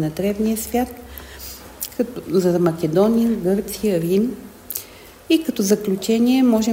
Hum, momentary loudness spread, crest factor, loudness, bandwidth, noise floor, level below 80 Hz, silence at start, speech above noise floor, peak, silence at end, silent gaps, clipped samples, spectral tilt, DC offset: none; 18 LU; 18 dB; -20 LUFS; 16.5 kHz; -40 dBFS; -46 dBFS; 0 s; 22 dB; -2 dBFS; 0 s; none; under 0.1%; -5.5 dB/octave; under 0.1%